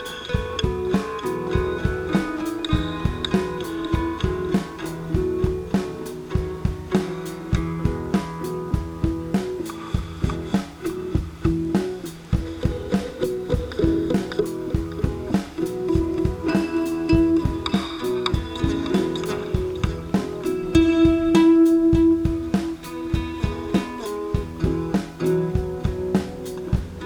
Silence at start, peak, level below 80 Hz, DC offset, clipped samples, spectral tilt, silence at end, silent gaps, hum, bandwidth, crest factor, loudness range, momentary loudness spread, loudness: 0 s; -4 dBFS; -32 dBFS; under 0.1%; under 0.1%; -7 dB/octave; 0 s; none; none; 17.5 kHz; 18 dB; 7 LU; 10 LU; -24 LUFS